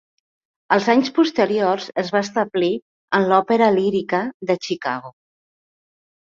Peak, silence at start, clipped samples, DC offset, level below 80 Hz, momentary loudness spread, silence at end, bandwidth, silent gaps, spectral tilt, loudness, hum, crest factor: -2 dBFS; 0.7 s; under 0.1%; under 0.1%; -66 dBFS; 8 LU; 1.2 s; 7.6 kHz; 2.82-3.08 s, 4.34-4.40 s; -5.5 dB/octave; -19 LUFS; none; 18 dB